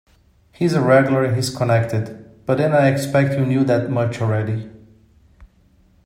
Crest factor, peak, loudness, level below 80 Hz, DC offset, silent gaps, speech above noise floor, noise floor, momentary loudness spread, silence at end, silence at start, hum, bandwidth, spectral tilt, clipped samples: 18 dB; 0 dBFS; -18 LUFS; -54 dBFS; under 0.1%; none; 38 dB; -55 dBFS; 11 LU; 0.6 s; 0.6 s; none; 16 kHz; -7 dB/octave; under 0.1%